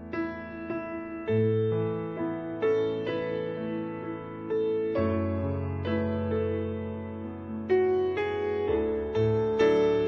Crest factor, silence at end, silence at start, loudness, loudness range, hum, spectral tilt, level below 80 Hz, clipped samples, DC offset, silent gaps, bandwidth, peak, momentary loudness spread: 16 dB; 0 s; 0 s; -29 LUFS; 2 LU; none; -8.5 dB/octave; -54 dBFS; under 0.1%; under 0.1%; none; 6.4 kHz; -12 dBFS; 11 LU